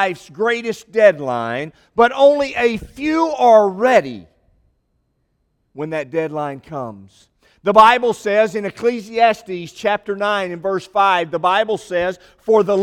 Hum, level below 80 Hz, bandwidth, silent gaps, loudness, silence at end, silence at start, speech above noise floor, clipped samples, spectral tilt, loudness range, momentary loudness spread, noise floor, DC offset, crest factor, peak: none; -52 dBFS; 14 kHz; none; -17 LUFS; 0 s; 0 s; 50 dB; under 0.1%; -5 dB/octave; 7 LU; 14 LU; -67 dBFS; under 0.1%; 18 dB; 0 dBFS